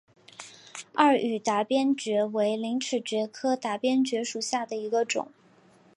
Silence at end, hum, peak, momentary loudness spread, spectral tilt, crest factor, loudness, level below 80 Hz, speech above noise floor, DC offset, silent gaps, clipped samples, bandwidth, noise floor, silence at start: 0.7 s; none; -6 dBFS; 18 LU; -3.5 dB/octave; 22 dB; -27 LUFS; -82 dBFS; 32 dB; under 0.1%; none; under 0.1%; 11.5 kHz; -58 dBFS; 0.4 s